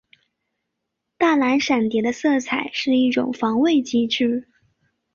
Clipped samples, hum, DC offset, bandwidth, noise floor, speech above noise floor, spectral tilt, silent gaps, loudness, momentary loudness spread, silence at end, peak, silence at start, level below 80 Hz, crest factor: under 0.1%; none; under 0.1%; 7.4 kHz; -79 dBFS; 60 dB; -4 dB/octave; none; -20 LUFS; 4 LU; 0.7 s; -6 dBFS; 1.2 s; -64 dBFS; 14 dB